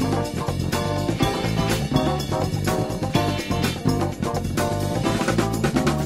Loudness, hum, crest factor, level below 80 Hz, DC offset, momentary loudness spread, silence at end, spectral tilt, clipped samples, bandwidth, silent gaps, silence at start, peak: -23 LUFS; none; 18 dB; -36 dBFS; 0.1%; 3 LU; 0 s; -5.5 dB/octave; under 0.1%; 16 kHz; none; 0 s; -4 dBFS